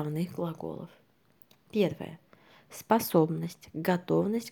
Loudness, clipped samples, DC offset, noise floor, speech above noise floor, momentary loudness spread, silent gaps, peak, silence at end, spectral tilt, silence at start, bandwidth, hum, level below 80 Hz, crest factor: -30 LUFS; under 0.1%; under 0.1%; -62 dBFS; 32 dB; 18 LU; none; -8 dBFS; 0 s; -6.5 dB/octave; 0 s; over 20 kHz; none; -72 dBFS; 22 dB